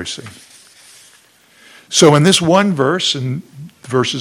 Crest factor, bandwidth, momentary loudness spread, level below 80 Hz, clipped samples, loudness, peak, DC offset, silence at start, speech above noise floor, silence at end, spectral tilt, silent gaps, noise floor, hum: 16 dB; 16.5 kHz; 18 LU; -56 dBFS; 0.1%; -13 LUFS; 0 dBFS; under 0.1%; 0 s; 36 dB; 0 s; -4 dB/octave; none; -49 dBFS; none